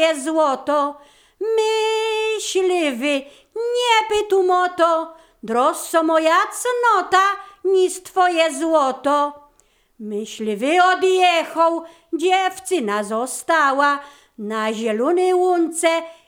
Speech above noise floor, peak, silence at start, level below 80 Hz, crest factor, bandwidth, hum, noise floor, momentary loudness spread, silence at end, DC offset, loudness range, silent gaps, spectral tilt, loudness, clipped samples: 41 dB; -2 dBFS; 0 s; -62 dBFS; 16 dB; 18.5 kHz; none; -59 dBFS; 10 LU; 0.15 s; under 0.1%; 3 LU; none; -2.5 dB/octave; -19 LUFS; under 0.1%